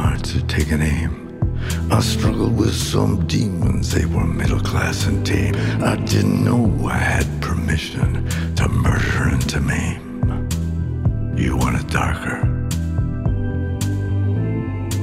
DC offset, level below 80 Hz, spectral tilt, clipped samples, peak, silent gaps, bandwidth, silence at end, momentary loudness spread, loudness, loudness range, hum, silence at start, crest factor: under 0.1%; -28 dBFS; -6 dB/octave; under 0.1%; -2 dBFS; none; 15.5 kHz; 0 s; 5 LU; -20 LUFS; 2 LU; none; 0 s; 18 dB